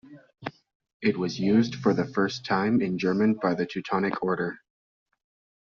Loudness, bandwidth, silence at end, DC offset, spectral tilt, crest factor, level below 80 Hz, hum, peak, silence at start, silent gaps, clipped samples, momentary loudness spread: -26 LUFS; 7 kHz; 1.1 s; under 0.1%; -5.5 dB/octave; 18 dB; -64 dBFS; none; -8 dBFS; 0.05 s; 0.75-0.80 s, 0.94-1.00 s; under 0.1%; 15 LU